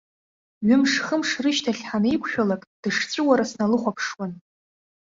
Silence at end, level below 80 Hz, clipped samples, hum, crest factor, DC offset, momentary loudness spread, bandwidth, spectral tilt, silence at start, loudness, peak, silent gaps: 0.75 s; -62 dBFS; under 0.1%; none; 20 dB; under 0.1%; 9 LU; 7.8 kHz; -4.5 dB/octave; 0.6 s; -23 LUFS; -4 dBFS; 2.67-2.83 s